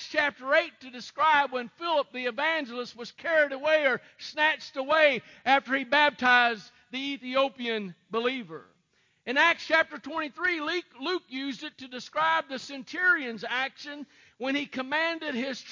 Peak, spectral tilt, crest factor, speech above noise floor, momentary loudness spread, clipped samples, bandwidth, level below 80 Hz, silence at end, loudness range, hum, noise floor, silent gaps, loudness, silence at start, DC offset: -8 dBFS; -3 dB/octave; 20 dB; 42 dB; 15 LU; under 0.1%; 7.4 kHz; -74 dBFS; 0 s; 5 LU; none; -70 dBFS; none; -27 LUFS; 0 s; under 0.1%